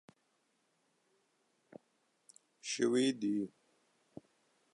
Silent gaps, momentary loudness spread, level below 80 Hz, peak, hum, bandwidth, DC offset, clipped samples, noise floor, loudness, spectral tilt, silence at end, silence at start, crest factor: none; 26 LU; -88 dBFS; -20 dBFS; none; 11 kHz; under 0.1%; under 0.1%; -78 dBFS; -35 LUFS; -4 dB/octave; 1.25 s; 2.65 s; 20 dB